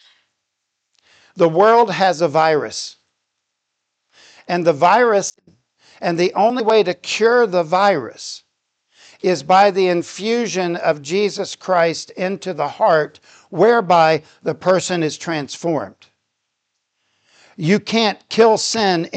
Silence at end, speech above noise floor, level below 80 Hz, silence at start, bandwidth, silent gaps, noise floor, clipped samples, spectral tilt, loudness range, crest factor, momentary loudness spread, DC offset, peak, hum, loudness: 0 s; 59 dB; -70 dBFS; 1.35 s; 9.2 kHz; none; -76 dBFS; under 0.1%; -4.5 dB/octave; 3 LU; 16 dB; 12 LU; under 0.1%; -2 dBFS; none; -17 LUFS